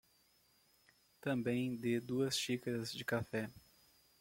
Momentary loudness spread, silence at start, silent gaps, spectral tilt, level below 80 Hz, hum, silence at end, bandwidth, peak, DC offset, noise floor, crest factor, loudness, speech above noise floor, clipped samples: 7 LU; 1.25 s; none; -4.5 dB/octave; -74 dBFS; none; 0.6 s; 16.5 kHz; -24 dBFS; under 0.1%; -73 dBFS; 16 dB; -39 LUFS; 34 dB; under 0.1%